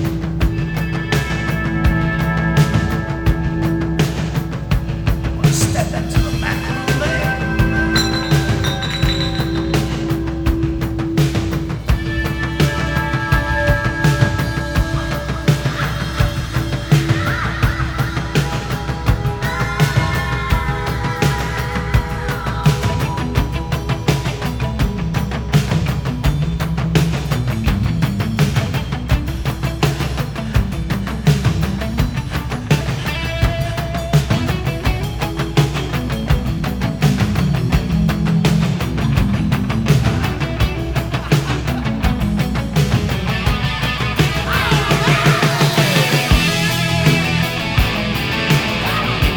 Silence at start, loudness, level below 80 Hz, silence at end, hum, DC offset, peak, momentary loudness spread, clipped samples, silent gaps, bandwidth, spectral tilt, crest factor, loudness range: 0 s; -18 LUFS; -24 dBFS; 0 s; none; under 0.1%; 0 dBFS; 6 LU; under 0.1%; none; over 20 kHz; -5.5 dB/octave; 16 dB; 4 LU